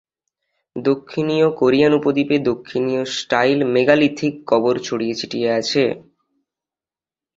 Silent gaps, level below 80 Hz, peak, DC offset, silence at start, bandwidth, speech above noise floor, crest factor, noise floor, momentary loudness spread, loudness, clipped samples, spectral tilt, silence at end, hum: none; -58 dBFS; -2 dBFS; under 0.1%; 0.75 s; 7.8 kHz; over 72 dB; 18 dB; under -90 dBFS; 8 LU; -18 LUFS; under 0.1%; -5.5 dB/octave; 1.35 s; none